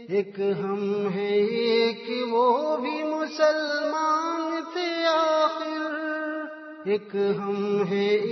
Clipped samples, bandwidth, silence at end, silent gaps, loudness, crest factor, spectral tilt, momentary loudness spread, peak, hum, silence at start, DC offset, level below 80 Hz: under 0.1%; 6.2 kHz; 0 s; none; -25 LUFS; 16 dB; -5.5 dB/octave; 7 LU; -10 dBFS; none; 0 s; under 0.1%; -80 dBFS